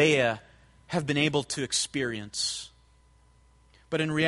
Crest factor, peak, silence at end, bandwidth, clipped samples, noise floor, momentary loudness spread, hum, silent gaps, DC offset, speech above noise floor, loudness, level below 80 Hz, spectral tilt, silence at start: 20 dB; -8 dBFS; 0 s; 11.5 kHz; under 0.1%; -60 dBFS; 9 LU; none; none; under 0.1%; 33 dB; -28 LUFS; -60 dBFS; -3.5 dB/octave; 0 s